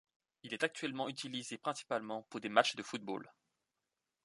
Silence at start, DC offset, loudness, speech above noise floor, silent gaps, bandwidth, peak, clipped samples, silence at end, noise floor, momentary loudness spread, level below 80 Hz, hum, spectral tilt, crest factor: 0.45 s; under 0.1%; -38 LUFS; 51 dB; none; 11.5 kHz; -12 dBFS; under 0.1%; 0.95 s; -89 dBFS; 13 LU; -86 dBFS; none; -3 dB/octave; 28 dB